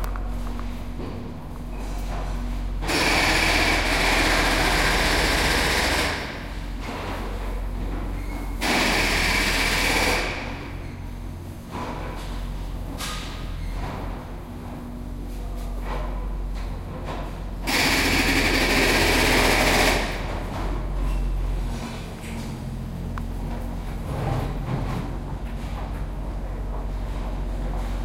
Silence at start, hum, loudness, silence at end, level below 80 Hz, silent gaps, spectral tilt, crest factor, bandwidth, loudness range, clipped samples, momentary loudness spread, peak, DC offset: 0 s; none; -24 LUFS; 0 s; -30 dBFS; none; -3.5 dB/octave; 20 dB; 16 kHz; 13 LU; under 0.1%; 16 LU; -4 dBFS; under 0.1%